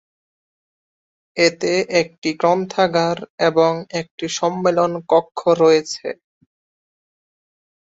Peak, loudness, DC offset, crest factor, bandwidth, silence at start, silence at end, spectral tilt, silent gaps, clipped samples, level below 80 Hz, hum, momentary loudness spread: -2 dBFS; -18 LUFS; under 0.1%; 18 dB; 8 kHz; 1.35 s; 1.8 s; -4.5 dB/octave; 2.18-2.22 s, 3.30-3.38 s, 4.11-4.18 s; under 0.1%; -64 dBFS; none; 12 LU